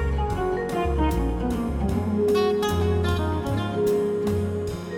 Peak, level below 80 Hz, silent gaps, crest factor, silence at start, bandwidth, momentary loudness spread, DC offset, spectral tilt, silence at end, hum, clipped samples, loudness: -12 dBFS; -32 dBFS; none; 12 dB; 0 s; 17 kHz; 5 LU; under 0.1%; -7 dB/octave; 0 s; none; under 0.1%; -24 LUFS